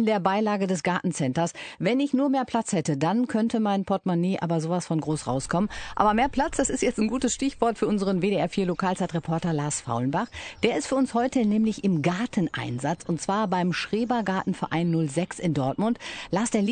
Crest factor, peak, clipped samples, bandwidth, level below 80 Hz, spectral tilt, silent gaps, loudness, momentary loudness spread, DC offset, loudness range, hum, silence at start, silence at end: 20 dB; -6 dBFS; under 0.1%; 9.4 kHz; -50 dBFS; -5.5 dB/octave; none; -26 LUFS; 4 LU; under 0.1%; 2 LU; none; 0 s; 0 s